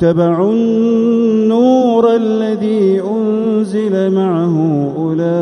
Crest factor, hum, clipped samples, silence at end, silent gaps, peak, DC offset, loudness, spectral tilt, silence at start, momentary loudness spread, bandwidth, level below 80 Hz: 12 dB; none; under 0.1%; 0 s; none; 0 dBFS; under 0.1%; -13 LUFS; -8.5 dB/octave; 0 s; 5 LU; 10 kHz; -54 dBFS